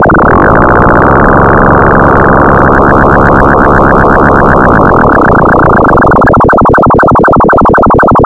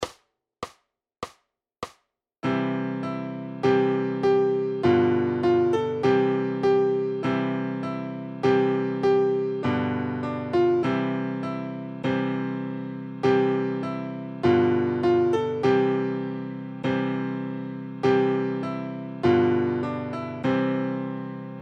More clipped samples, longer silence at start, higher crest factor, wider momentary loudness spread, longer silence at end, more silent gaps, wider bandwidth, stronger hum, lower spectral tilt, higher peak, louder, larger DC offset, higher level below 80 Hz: first, 5% vs under 0.1%; about the same, 0 s vs 0 s; second, 4 dB vs 16 dB; second, 0 LU vs 12 LU; about the same, 0 s vs 0 s; neither; first, 10 kHz vs 8.4 kHz; neither; first, -9.5 dB/octave vs -8 dB/octave; first, 0 dBFS vs -10 dBFS; first, -4 LUFS vs -25 LUFS; neither; first, -16 dBFS vs -62 dBFS